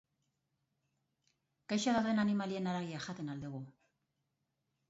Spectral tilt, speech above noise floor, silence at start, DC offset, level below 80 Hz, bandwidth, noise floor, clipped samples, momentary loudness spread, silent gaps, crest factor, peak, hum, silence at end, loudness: -5 dB/octave; 49 dB; 1.7 s; under 0.1%; -74 dBFS; 7.6 kHz; -85 dBFS; under 0.1%; 14 LU; none; 18 dB; -22 dBFS; none; 1.2 s; -36 LUFS